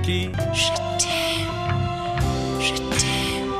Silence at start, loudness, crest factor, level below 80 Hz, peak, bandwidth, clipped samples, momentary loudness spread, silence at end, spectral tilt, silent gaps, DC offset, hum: 0 s; -22 LUFS; 18 dB; -36 dBFS; -6 dBFS; 15 kHz; under 0.1%; 4 LU; 0 s; -3.5 dB/octave; none; under 0.1%; none